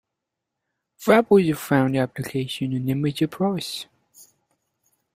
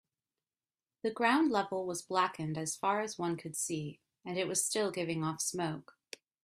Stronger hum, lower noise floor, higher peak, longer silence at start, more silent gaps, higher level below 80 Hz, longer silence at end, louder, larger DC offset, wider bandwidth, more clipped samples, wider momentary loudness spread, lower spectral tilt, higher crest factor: neither; second, -83 dBFS vs under -90 dBFS; first, -2 dBFS vs -14 dBFS; about the same, 1 s vs 1.05 s; neither; first, -60 dBFS vs -76 dBFS; first, 1.35 s vs 0.6 s; first, -22 LUFS vs -34 LUFS; neither; about the same, 16 kHz vs 15.5 kHz; neither; second, 12 LU vs 15 LU; first, -6.5 dB/octave vs -3.5 dB/octave; about the same, 22 dB vs 20 dB